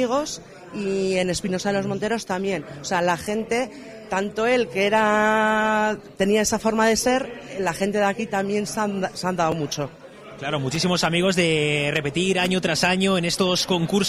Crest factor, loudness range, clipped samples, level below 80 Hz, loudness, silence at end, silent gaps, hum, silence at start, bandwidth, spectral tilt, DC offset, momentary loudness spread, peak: 16 dB; 4 LU; under 0.1%; -52 dBFS; -22 LUFS; 0 s; none; none; 0 s; 15.5 kHz; -4 dB/octave; under 0.1%; 9 LU; -8 dBFS